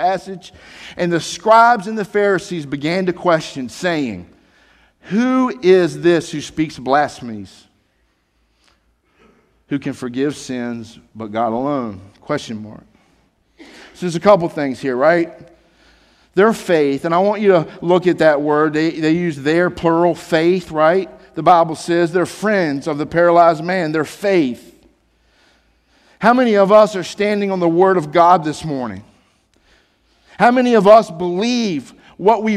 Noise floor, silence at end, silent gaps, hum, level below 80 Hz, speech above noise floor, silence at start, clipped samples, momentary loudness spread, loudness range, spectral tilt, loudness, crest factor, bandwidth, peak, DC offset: -62 dBFS; 0 s; none; none; -54 dBFS; 47 dB; 0 s; under 0.1%; 14 LU; 9 LU; -6 dB/octave; -16 LUFS; 16 dB; 13.5 kHz; 0 dBFS; under 0.1%